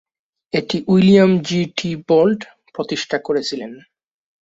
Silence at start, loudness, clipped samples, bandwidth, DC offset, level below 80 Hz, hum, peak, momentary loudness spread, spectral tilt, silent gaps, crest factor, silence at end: 0.55 s; -17 LUFS; under 0.1%; 7.8 kHz; under 0.1%; -56 dBFS; none; -2 dBFS; 16 LU; -6.5 dB/octave; none; 16 dB; 0.65 s